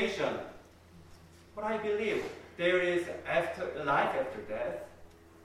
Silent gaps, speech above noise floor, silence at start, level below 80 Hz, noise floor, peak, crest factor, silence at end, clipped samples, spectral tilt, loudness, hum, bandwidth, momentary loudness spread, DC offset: none; 23 dB; 0 s; -62 dBFS; -56 dBFS; -16 dBFS; 18 dB; 0 s; under 0.1%; -5 dB/octave; -33 LUFS; none; 15 kHz; 14 LU; under 0.1%